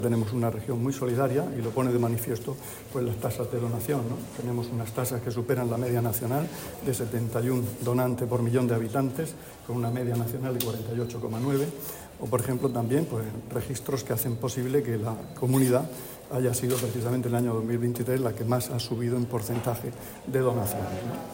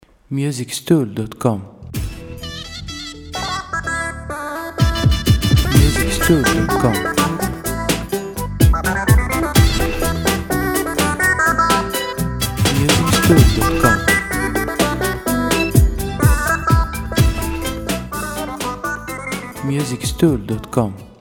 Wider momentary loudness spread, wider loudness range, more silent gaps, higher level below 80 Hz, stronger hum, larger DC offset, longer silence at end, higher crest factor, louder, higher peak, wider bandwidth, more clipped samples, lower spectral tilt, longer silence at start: second, 8 LU vs 12 LU; second, 2 LU vs 7 LU; neither; second, -56 dBFS vs -24 dBFS; neither; neither; about the same, 0 s vs 0.1 s; about the same, 18 dB vs 16 dB; second, -29 LUFS vs -17 LUFS; second, -10 dBFS vs 0 dBFS; second, 16.5 kHz vs 19 kHz; neither; first, -6.5 dB/octave vs -5 dB/octave; second, 0 s vs 0.3 s